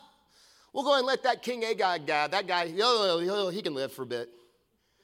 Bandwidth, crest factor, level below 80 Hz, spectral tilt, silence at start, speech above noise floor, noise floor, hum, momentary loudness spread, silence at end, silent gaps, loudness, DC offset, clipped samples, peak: 16.5 kHz; 18 dB; -78 dBFS; -3.5 dB/octave; 0.75 s; 43 dB; -71 dBFS; none; 11 LU; 0.75 s; none; -28 LUFS; under 0.1%; under 0.1%; -10 dBFS